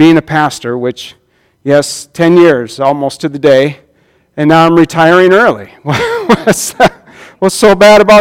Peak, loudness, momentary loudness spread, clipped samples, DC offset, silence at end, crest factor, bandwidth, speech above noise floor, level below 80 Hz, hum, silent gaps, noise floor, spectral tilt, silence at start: 0 dBFS; -9 LUFS; 12 LU; 2%; under 0.1%; 0 s; 8 dB; 16.5 kHz; 44 dB; -42 dBFS; none; none; -51 dBFS; -5 dB/octave; 0 s